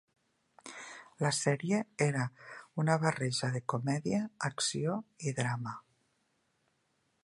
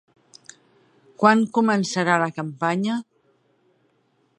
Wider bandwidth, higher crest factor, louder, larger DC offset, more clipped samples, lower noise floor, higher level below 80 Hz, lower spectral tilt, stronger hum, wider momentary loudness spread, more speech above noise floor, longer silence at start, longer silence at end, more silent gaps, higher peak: about the same, 11.5 kHz vs 10.5 kHz; about the same, 22 dB vs 22 dB; second, -33 LUFS vs -21 LUFS; neither; neither; first, -77 dBFS vs -66 dBFS; about the same, -74 dBFS vs -74 dBFS; about the same, -5 dB/octave vs -5.5 dB/octave; neither; first, 17 LU vs 9 LU; about the same, 44 dB vs 45 dB; second, 0.65 s vs 1.2 s; about the same, 1.45 s vs 1.35 s; neither; second, -12 dBFS vs -2 dBFS